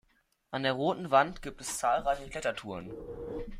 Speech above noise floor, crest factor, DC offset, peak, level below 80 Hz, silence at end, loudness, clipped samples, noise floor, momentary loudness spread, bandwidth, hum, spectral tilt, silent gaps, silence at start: 40 dB; 20 dB; under 0.1%; -12 dBFS; -52 dBFS; 0 s; -32 LUFS; under 0.1%; -72 dBFS; 15 LU; 16 kHz; none; -4 dB/octave; none; 0.5 s